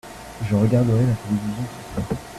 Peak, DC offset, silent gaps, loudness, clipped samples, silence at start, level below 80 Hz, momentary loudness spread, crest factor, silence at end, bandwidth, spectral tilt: -6 dBFS; under 0.1%; none; -22 LUFS; under 0.1%; 0.05 s; -44 dBFS; 13 LU; 16 dB; 0 s; 14 kHz; -8 dB/octave